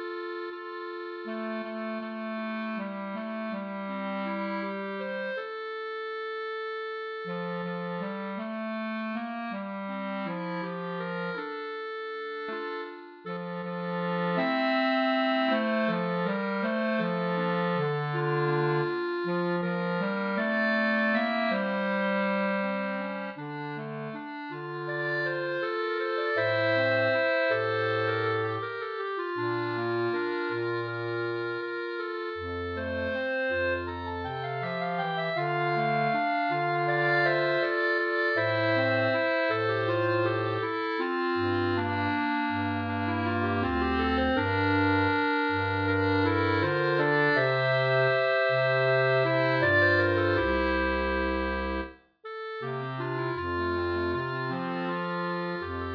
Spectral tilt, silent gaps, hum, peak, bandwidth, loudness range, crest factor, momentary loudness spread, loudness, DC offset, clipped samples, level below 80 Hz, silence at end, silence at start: -8 dB/octave; none; none; -12 dBFS; 5.4 kHz; 9 LU; 16 dB; 11 LU; -28 LUFS; under 0.1%; under 0.1%; -50 dBFS; 0 s; 0 s